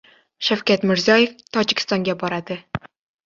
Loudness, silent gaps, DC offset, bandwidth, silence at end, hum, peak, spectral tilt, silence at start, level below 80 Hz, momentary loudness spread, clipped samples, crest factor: -20 LUFS; none; under 0.1%; 7.6 kHz; 0.5 s; none; -2 dBFS; -4.5 dB/octave; 0.4 s; -56 dBFS; 14 LU; under 0.1%; 20 dB